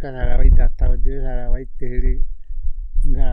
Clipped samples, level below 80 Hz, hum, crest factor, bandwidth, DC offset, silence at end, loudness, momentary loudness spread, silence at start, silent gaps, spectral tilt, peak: under 0.1%; -16 dBFS; none; 12 dB; 2.4 kHz; under 0.1%; 0 s; -24 LUFS; 14 LU; 0 s; none; -9.5 dB/octave; -2 dBFS